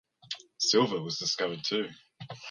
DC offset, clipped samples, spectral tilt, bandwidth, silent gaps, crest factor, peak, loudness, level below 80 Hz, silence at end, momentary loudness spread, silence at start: under 0.1%; under 0.1%; -3 dB/octave; 10.5 kHz; none; 20 dB; -12 dBFS; -29 LUFS; -76 dBFS; 0 s; 18 LU; 0.25 s